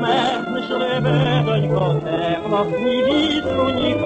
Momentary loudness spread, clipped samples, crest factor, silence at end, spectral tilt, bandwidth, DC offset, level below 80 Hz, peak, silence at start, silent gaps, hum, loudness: 4 LU; under 0.1%; 12 dB; 0 s; -7 dB/octave; 8.4 kHz; under 0.1%; -46 dBFS; -6 dBFS; 0 s; none; none; -19 LUFS